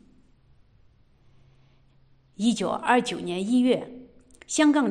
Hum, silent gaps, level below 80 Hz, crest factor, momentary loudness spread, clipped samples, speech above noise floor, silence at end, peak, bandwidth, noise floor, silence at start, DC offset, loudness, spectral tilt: none; none; -64 dBFS; 20 dB; 9 LU; under 0.1%; 36 dB; 0 s; -8 dBFS; 11 kHz; -59 dBFS; 2.4 s; under 0.1%; -24 LUFS; -4 dB/octave